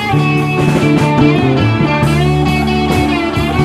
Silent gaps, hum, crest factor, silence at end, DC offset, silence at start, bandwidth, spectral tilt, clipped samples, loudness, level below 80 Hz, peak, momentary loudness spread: none; none; 12 dB; 0 s; under 0.1%; 0 s; 14.5 kHz; -7 dB/octave; under 0.1%; -12 LUFS; -28 dBFS; 0 dBFS; 3 LU